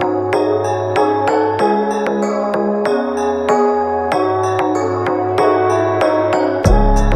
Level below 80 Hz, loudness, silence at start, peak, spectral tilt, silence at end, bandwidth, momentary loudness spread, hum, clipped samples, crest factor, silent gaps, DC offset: -24 dBFS; -15 LUFS; 0 s; 0 dBFS; -6.5 dB/octave; 0 s; 12.5 kHz; 3 LU; none; under 0.1%; 14 dB; none; under 0.1%